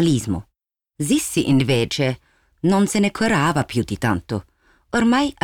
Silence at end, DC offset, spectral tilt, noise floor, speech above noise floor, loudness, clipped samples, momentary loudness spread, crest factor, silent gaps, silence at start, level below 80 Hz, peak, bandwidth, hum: 0.15 s; under 0.1%; -5 dB/octave; -77 dBFS; 58 dB; -20 LUFS; under 0.1%; 10 LU; 12 dB; none; 0 s; -48 dBFS; -8 dBFS; 19.5 kHz; none